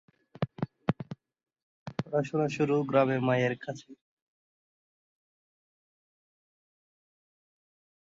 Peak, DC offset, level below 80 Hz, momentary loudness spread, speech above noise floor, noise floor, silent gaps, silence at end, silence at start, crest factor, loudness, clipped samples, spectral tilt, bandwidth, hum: -12 dBFS; under 0.1%; -70 dBFS; 18 LU; over 62 dB; under -90 dBFS; 1.63-1.86 s; 4.15 s; 0.4 s; 22 dB; -30 LUFS; under 0.1%; -7.5 dB/octave; 7.8 kHz; none